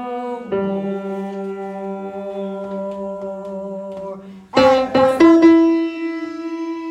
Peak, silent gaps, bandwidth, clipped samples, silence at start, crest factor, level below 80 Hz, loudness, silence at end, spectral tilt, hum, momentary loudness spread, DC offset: 0 dBFS; none; 8.4 kHz; under 0.1%; 0 s; 18 dB; -54 dBFS; -18 LUFS; 0 s; -6.5 dB/octave; none; 17 LU; under 0.1%